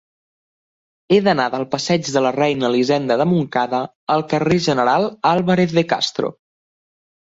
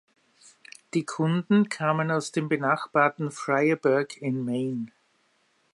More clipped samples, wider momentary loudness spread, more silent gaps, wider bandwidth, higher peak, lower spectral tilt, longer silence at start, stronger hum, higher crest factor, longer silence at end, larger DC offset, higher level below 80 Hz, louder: neither; second, 5 LU vs 8 LU; first, 3.95-4.07 s vs none; second, 7.8 kHz vs 11.5 kHz; first, -2 dBFS vs -8 dBFS; about the same, -5.5 dB/octave vs -6.5 dB/octave; first, 1.1 s vs 0.95 s; neither; about the same, 16 dB vs 20 dB; first, 1.05 s vs 0.85 s; neither; first, -56 dBFS vs -76 dBFS; first, -18 LUFS vs -26 LUFS